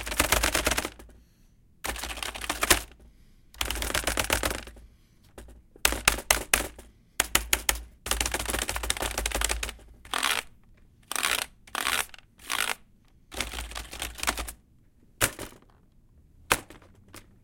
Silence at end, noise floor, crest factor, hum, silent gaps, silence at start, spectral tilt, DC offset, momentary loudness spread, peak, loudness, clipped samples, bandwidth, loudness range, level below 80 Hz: 0.25 s; -59 dBFS; 30 dB; none; none; 0 s; -1.5 dB/octave; under 0.1%; 14 LU; -2 dBFS; -28 LUFS; under 0.1%; 17 kHz; 6 LU; -42 dBFS